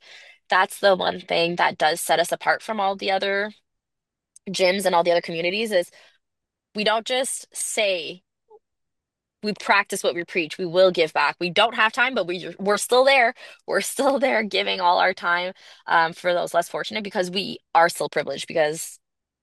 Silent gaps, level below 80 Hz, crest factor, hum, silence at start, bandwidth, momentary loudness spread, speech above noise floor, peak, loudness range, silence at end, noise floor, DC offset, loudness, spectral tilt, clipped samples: none; -74 dBFS; 18 dB; none; 0.1 s; 12.5 kHz; 9 LU; 62 dB; -4 dBFS; 5 LU; 0.45 s; -84 dBFS; under 0.1%; -22 LUFS; -2.5 dB/octave; under 0.1%